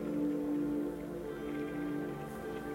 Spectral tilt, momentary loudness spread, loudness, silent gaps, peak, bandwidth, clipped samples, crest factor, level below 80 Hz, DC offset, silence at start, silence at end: -7.5 dB/octave; 7 LU; -38 LUFS; none; -26 dBFS; 16 kHz; under 0.1%; 12 dB; -60 dBFS; under 0.1%; 0 s; 0 s